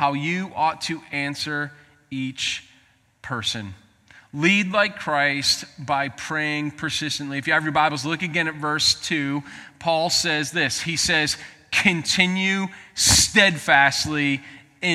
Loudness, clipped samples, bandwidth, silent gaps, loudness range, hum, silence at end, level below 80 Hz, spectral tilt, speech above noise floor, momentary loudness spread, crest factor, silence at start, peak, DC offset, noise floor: -21 LUFS; under 0.1%; 16.5 kHz; none; 9 LU; none; 0 s; -50 dBFS; -2.5 dB/octave; 36 dB; 13 LU; 22 dB; 0 s; -2 dBFS; under 0.1%; -58 dBFS